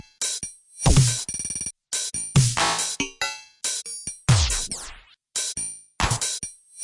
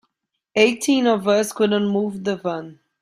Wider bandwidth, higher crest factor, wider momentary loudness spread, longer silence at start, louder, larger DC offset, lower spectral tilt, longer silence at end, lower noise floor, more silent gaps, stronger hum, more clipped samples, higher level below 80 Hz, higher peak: second, 11.5 kHz vs 16 kHz; about the same, 18 dB vs 18 dB; about the same, 11 LU vs 9 LU; second, 0.2 s vs 0.55 s; second, -24 LUFS vs -20 LUFS; neither; second, -3 dB/octave vs -4.5 dB/octave; second, 0 s vs 0.3 s; second, -45 dBFS vs -74 dBFS; neither; neither; neither; first, -34 dBFS vs -66 dBFS; second, -6 dBFS vs -2 dBFS